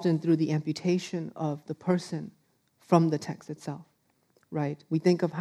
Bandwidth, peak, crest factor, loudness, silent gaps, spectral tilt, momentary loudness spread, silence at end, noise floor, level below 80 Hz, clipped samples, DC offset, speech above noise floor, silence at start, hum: 11.5 kHz; -8 dBFS; 22 dB; -29 LUFS; none; -7.5 dB/octave; 14 LU; 0 s; -69 dBFS; -78 dBFS; under 0.1%; under 0.1%; 41 dB; 0 s; none